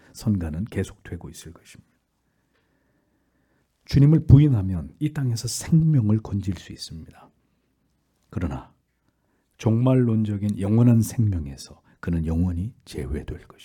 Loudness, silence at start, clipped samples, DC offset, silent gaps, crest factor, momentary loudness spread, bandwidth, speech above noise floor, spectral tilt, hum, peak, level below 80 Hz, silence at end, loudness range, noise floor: -22 LUFS; 0.15 s; under 0.1%; under 0.1%; none; 22 dB; 20 LU; 18 kHz; 48 dB; -7.5 dB/octave; none; 0 dBFS; -42 dBFS; 0.25 s; 13 LU; -70 dBFS